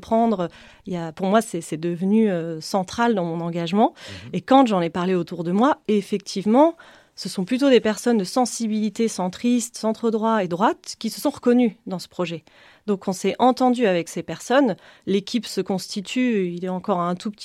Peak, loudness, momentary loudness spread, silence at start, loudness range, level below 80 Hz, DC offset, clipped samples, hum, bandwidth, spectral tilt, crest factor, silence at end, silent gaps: -4 dBFS; -22 LUFS; 12 LU; 0 s; 3 LU; -62 dBFS; under 0.1%; under 0.1%; none; 15 kHz; -5.5 dB/octave; 18 dB; 0 s; none